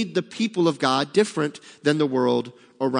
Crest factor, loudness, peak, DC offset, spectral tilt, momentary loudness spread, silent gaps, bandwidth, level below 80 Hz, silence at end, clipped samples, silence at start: 18 dB; -23 LUFS; -4 dBFS; under 0.1%; -5.5 dB/octave; 7 LU; none; 10.5 kHz; -76 dBFS; 0 s; under 0.1%; 0 s